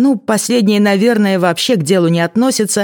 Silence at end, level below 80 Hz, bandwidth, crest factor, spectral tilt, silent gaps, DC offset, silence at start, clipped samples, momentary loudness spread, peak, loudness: 0 s; -64 dBFS; 17.5 kHz; 12 dB; -4.5 dB/octave; none; under 0.1%; 0 s; under 0.1%; 2 LU; 0 dBFS; -13 LUFS